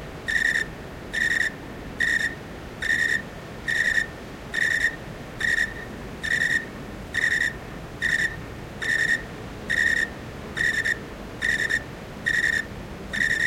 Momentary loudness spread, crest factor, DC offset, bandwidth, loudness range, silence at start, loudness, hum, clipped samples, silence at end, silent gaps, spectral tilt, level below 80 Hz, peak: 16 LU; 18 dB; under 0.1%; 16.5 kHz; 1 LU; 0 s; -24 LUFS; none; under 0.1%; 0 s; none; -3 dB/octave; -46 dBFS; -10 dBFS